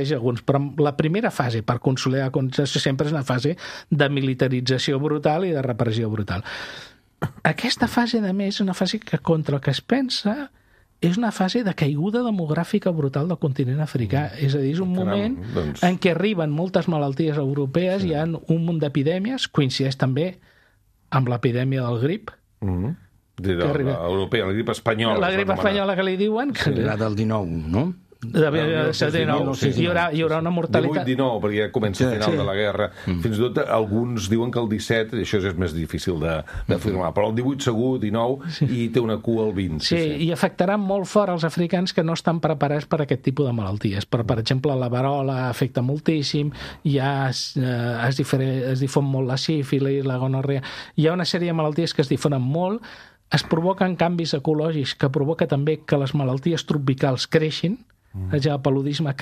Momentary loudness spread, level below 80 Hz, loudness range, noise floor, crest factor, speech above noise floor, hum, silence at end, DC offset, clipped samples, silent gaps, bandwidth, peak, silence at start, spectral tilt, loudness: 5 LU; -50 dBFS; 2 LU; -60 dBFS; 20 dB; 38 dB; none; 0 s; under 0.1%; under 0.1%; none; 14.5 kHz; -2 dBFS; 0 s; -6.5 dB/octave; -22 LUFS